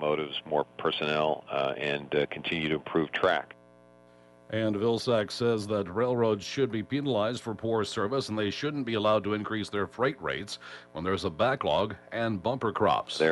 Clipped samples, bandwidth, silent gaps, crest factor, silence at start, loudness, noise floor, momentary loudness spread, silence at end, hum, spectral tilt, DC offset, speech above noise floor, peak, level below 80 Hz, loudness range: under 0.1%; 11.5 kHz; none; 18 dB; 0 s; -29 LUFS; -57 dBFS; 6 LU; 0 s; 60 Hz at -55 dBFS; -5.5 dB/octave; under 0.1%; 28 dB; -12 dBFS; -62 dBFS; 2 LU